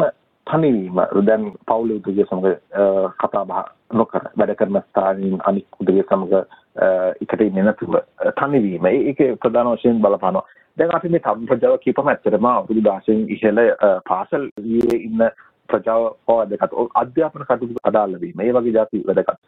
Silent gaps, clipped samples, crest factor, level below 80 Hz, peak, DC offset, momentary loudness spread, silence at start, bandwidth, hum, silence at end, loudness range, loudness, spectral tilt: 14.52-14.56 s; under 0.1%; 18 dB; -58 dBFS; 0 dBFS; under 0.1%; 5 LU; 0 s; 4.1 kHz; none; 0.1 s; 2 LU; -18 LUFS; -9.5 dB/octave